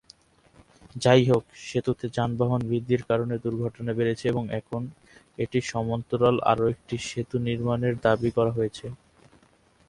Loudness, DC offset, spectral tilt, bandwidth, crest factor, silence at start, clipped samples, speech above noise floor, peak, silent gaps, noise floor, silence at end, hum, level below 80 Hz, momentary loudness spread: -26 LUFS; under 0.1%; -6.5 dB/octave; 11 kHz; 20 dB; 0.95 s; under 0.1%; 36 dB; -6 dBFS; none; -61 dBFS; 0.95 s; none; -54 dBFS; 10 LU